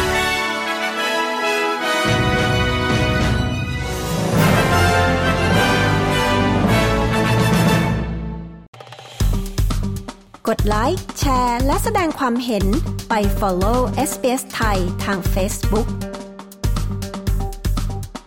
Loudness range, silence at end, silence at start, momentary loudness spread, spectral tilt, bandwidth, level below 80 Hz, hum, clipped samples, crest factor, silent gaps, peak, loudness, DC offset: 6 LU; 0.05 s; 0 s; 11 LU; -5 dB/octave; 17.5 kHz; -26 dBFS; none; under 0.1%; 14 dB; 8.68-8.73 s; -4 dBFS; -19 LUFS; under 0.1%